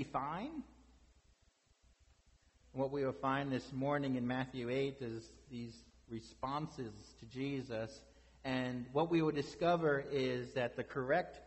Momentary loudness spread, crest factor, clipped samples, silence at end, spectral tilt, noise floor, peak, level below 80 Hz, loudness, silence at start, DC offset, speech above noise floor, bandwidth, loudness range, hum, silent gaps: 16 LU; 18 dB; under 0.1%; 0 s; -6.5 dB/octave; -73 dBFS; -22 dBFS; -66 dBFS; -39 LUFS; 0 s; under 0.1%; 35 dB; 8.2 kHz; 8 LU; none; none